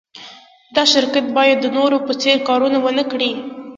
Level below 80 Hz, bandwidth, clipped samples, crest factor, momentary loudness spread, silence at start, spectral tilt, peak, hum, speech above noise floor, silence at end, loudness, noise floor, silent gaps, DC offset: -66 dBFS; 8.6 kHz; under 0.1%; 16 dB; 8 LU; 0.15 s; -2.5 dB/octave; 0 dBFS; none; 25 dB; 0 s; -16 LUFS; -41 dBFS; none; under 0.1%